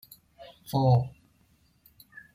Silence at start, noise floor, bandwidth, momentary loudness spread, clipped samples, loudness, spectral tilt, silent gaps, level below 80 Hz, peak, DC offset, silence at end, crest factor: 0.4 s; -65 dBFS; 16 kHz; 27 LU; under 0.1%; -26 LUFS; -8 dB/octave; none; -58 dBFS; -12 dBFS; under 0.1%; 1.25 s; 18 dB